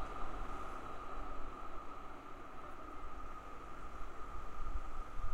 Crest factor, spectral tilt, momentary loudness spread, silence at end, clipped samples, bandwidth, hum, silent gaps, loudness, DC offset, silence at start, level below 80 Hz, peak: 14 dB; -6 dB/octave; 5 LU; 0 s; under 0.1%; 8 kHz; none; none; -49 LUFS; under 0.1%; 0 s; -46 dBFS; -26 dBFS